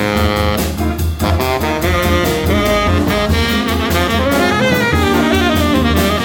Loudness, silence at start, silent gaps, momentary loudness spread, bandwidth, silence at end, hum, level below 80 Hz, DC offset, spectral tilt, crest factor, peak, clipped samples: -14 LUFS; 0 s; none; 4 LU; 19 kHz; 0 s; none; -24 dBFS; under 0.1%; -5 dB/octave; 12 dB; -2 dBFS; under 0.1%